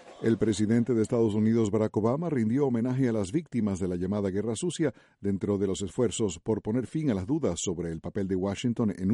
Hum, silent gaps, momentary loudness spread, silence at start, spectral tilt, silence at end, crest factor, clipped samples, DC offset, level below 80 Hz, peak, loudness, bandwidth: none; none; 6 LU; 0 s; -6.5 dB/octave; 0 s; 14 dB; under 0.1%; under 0.1%; -56 dBFS; -12 dBFS; -28 LUFS; 11.5 kHz